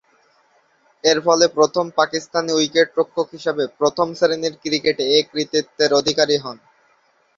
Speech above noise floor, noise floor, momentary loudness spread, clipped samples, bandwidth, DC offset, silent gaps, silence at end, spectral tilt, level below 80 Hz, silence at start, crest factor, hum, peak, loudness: 42 dB; -60 dBFS; 7 LU; under 0.1%; 7.6 kHz; under 0.1%; none; 0.85 s; -3 dB/octave; -62 dBFS; 1.05 s; 18 dB; none; 0 dBFS; -18 LUFS